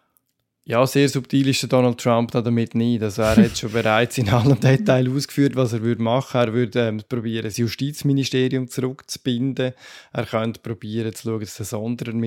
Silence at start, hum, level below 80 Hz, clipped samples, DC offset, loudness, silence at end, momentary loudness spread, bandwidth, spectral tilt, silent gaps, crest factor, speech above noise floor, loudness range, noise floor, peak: 0.7 s; none; -50 dBFS; under 0.1%; under 0.1%; -21 LUFS; 0 s; 10 LU; 17 kHz; -6 dB/octave; none; 18 dB; 48 dB; 6 LU; -68 dBFS; -2 dBFS